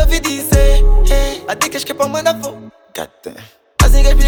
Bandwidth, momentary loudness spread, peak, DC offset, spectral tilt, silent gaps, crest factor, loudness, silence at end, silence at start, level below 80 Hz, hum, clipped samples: 19.5 kHz; 17 LU; 0 dBFS; under 0.1%; -4.5 dB/octave; none; 12 dB; -15 LUFS; 0 s; 0 s; -12 dBFS; none; under 0.1%